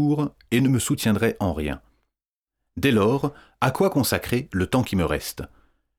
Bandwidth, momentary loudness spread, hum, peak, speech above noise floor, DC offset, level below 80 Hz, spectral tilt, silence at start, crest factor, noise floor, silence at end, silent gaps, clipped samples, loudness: over 20 kHz; 11 LU; none; -4 dBFS; 65 dB; under 0.1%; -44 dBFS; -5.5 dB/octave; 0 s; 20 dB; -87 dBFS; 0.55 s; 2.28-2.47 s; under 0.1%; -23 LUFS